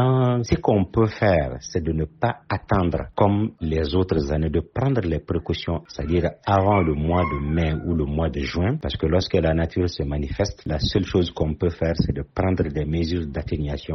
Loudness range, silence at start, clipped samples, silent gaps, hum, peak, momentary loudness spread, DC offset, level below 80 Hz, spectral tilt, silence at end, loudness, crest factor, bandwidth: 2 LU; 0 s; under 0.1%; none; none; -4 dBFS; 6 LU; under 0.1%; -36 dBFS; -6.5 dB/octave; 0 s; -23 LUFS; 18 dB; 6.4 kHz